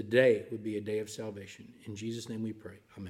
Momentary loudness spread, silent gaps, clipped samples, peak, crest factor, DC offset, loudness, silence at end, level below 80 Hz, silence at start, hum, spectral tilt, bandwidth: 22 LU; none; under 0.1%; -12 dBFS; 22 dB; under 0.1%; -33 LUFS; 0 s; -76 dBFS; 0 s; none; -5.5 dB/octave; 14.5 kHz